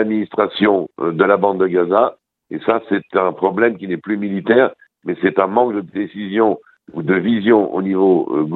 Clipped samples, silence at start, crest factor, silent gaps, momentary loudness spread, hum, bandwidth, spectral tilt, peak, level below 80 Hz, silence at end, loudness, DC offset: under 0.1%; 0 s; 16 dB; none; 10 LU; none; 4.3 kHz; -9.5 dB/octave; 0 dBFS; -60 dBFS; 0 s; -17 LUFS; under 0.1%